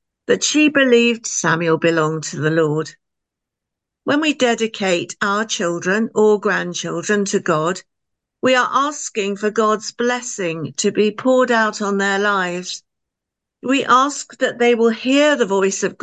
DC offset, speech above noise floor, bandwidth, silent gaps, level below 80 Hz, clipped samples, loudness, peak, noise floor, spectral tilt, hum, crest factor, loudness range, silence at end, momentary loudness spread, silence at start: under 0.1%; 65 dB; 9.2 kHz; none; -70 dBFS; under 0.1%; -17 LUFS; -2 dBFS; -83 dBFS; -3.5 dB/octave; none; 16 dB; 3 LU; 0.1 s; 9 LU; 0.3 s